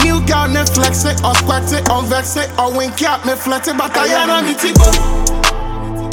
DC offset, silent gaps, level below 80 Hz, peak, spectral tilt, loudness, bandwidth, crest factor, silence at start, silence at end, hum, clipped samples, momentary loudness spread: under 0.1%; none; -20 dBFS; 0 dBFS; -4 dB/octave; -14 LUFS; 19 kHz; 14 dB; 0 s; 0 s; none; under 0.1%; 5 LU